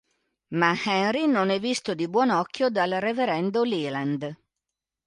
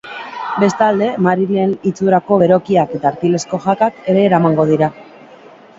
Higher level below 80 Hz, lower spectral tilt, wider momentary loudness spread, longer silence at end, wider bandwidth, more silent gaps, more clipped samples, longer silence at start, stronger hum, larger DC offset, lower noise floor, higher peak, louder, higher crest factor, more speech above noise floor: second, -70 dBFS vs -56 dBFS; second, -5 dB/octave vs -7 dB/octave; about the same, 6 LU vs 6 LU; about the same, 0.7 s vs 0.75 s; first, 11.5 kHz vs 7.8 kHz; neither; neither; first, 0.5 s vs 0.05 s; neither; neither; first, -86 dBFS vs -40 dBFS; second, -8 dBFS vs 0 dBFS; second, -25 LUFS vs -14 LUFS; about the same, 18 dB vs 14 dB; first, 62 dB vs 27 dB